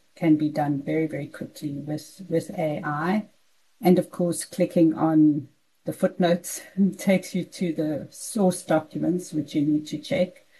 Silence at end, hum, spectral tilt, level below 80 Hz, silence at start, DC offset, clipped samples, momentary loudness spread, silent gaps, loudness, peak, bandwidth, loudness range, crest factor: 0.3 s; none; -6.5 dB/octave; -72 dBFS; 0.2 s; under 0.1%; under 0.1%; 11 LU; none; -25 LUFS; -8 dBFS; 12.5 kHz; 4 LU; 18 dB